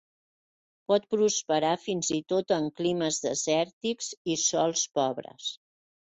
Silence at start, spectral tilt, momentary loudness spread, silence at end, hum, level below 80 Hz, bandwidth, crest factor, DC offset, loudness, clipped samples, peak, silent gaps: 0.9 s; -3 dB/octave; 10 LU; 0.55 s; none; -72 dBFS; 8.4 kHz; 18 dB; under 0.1%; -28 LUFS; under 0.1%; -12 dBFS; 3.73-3.81 s, 4.17-4.25 s